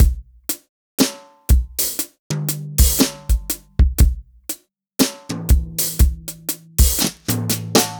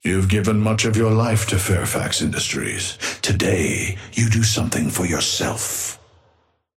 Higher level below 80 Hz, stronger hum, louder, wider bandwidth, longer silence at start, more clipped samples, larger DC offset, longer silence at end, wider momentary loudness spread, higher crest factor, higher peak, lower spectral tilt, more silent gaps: first, -20 dBFS vs -42 dBFS; neither; about the same, -20 LUFS vs -20 LUFS; first, over 20 kHz vs 16.5 kHz; about the same, 0 s vs 0.05 s; neither; neither; second, 0 s vs 0.8 s; first, 13 LU vs 6 LU; about the same, 16 dB vs 16 dB; about the same, -2 dBFS vs -4 dBFS; about the same, -4 dB/octave vs -4 dB/octave; first, 0.69-0.98 s, 2.19-2.30 s vs none